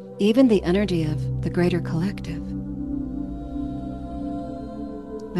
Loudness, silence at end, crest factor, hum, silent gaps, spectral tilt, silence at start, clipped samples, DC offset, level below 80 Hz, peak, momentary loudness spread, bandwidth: -25 LUFS; 0 s; 18 dB; none; none; -8 dB/octave; 0 s; under 0.1%; 0.2%; -40 dBFS; -6 dBFS; 15 LU; 12.5 kHz